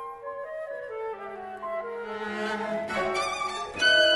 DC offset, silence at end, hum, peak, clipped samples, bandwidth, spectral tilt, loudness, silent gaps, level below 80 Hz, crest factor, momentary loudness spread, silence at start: under 0.1%; 0 s; none; -8 dBFS; under 0.1%; 11.5 kHz; -2 dB/octave; -29 LUFS; none; -62 dBFS; 20 dB; 13 LU; 0 s